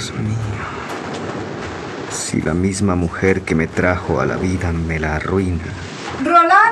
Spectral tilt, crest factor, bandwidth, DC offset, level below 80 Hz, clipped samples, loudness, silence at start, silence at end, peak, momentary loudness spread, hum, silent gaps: -5.5 dB/octave; 16 dB; 13 kHz; under 0.1%; -38 dBFS; under 0.1%; -19 LUFS; 0 s; 0 s; 0 dBFS; 12 LU; none; none